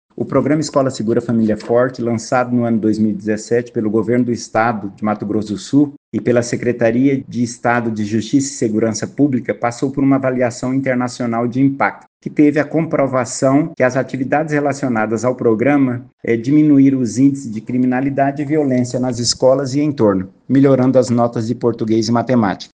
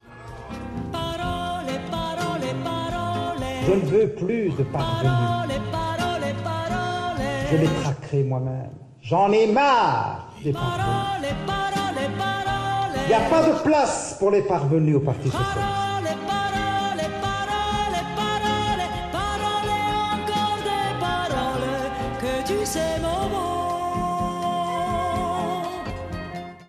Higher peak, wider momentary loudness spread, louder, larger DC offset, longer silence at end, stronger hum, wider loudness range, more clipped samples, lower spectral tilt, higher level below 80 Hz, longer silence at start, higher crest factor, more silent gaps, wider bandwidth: first, 0 dBFS vs -6 dBFS; second, 6 LU vs 9 LU; first, -16 LUFS vs -24 LUFS; neither; about the same, 0.1 s vs 0.05 s; neither; about the same, 3 LU vs 4 LU; neither; about the same, -6 dB/octave vs -5.5 dB/octave; second, -54 dBFS vs -42 dBFS; about the same, 0.15 s vs 0.05 s; about the same, 16 dB vs 16 dB; first, 5.97-6.12 s, 12.07-12.20 s, 16.13-16.18 s vs none; second, 9.6 kHz vs 14.5 kHz